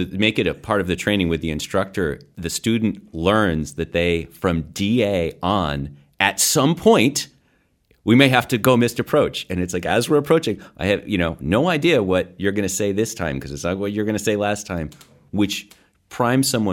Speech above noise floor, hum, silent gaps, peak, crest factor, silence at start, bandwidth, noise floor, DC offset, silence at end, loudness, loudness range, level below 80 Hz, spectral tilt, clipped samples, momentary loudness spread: 43 dB; none; none; 0 dBFS; 20 dB; 0 s; 17.5 kHz; -62 dBFS; under 0.1%; 0 s; -20 LUFS; 5 LU; -44 dBFS; -4.5 dB/octave; under 0.1%; 10 LU